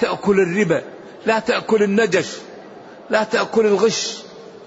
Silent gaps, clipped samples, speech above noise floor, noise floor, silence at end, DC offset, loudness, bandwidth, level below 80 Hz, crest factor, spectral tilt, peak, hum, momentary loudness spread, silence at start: none; under 0.1%; 21 dB; -39 dBFS; 0 s; under 0.1%; -18 LUFS; 8 kHz; -60 dBFS; 14 dB; -4.5 dB/octave; -4 dBFS; none; 18 LU; 0 s